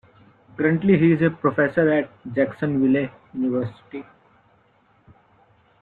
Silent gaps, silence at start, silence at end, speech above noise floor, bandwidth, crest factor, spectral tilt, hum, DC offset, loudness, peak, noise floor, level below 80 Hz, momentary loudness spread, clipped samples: none; 0.6 s; 1.8 s; 39 dB; 4.3 kHz; 18 dB; -10.5 dB/octave; none; under 0.1%; -21 LUFS; -4 dBFS; -60 dBFS; -60 dBFS; 16 LU; under 0.1%